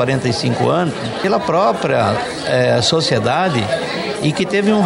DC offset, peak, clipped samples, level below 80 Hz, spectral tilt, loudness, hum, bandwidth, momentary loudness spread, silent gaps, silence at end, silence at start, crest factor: under 0.1%; -4 dBFS; under 0.1%; -50 dBFS; -5 dB/octave; -16 LUFS; none; 11.5 kHz; 6 LU; none; 0 s; 0 s; 12 dB